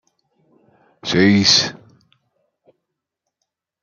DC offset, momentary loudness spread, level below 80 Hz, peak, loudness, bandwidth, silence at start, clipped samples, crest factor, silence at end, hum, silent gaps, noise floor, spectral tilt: under 0.1%; 14 LU; -58 dBFS; -2 dBFS; -14 LUFS; 7.4 kHz; 1.05 s; under 0.1%; 20 dB; 2.05 s; none; none; -80 dBFS; -3.5 dB/octave